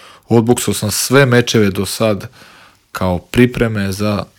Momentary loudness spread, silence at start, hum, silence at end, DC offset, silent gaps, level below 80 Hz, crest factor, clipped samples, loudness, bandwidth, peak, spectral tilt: 9 LU; 0.3 s; none; 0.15 s; under 0.1%; none; -40 dBFS; 14 dB; 0.2%; -14 LUFS; 18 kHz; 0 dBFS; -5 dB/octave